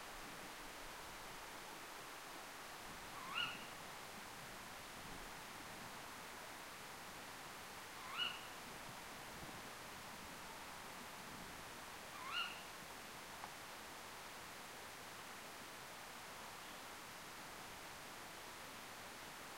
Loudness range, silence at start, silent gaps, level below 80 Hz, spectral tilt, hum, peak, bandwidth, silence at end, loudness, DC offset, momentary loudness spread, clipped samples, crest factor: 3 LU; 0 s; none; -70 dBFS; -1.5 dB/octave; none; -30 dBFS; 16 kHz; 0 s; -50 LUFS; under 0.1%; 8 LU; under 0.1%; 22 dB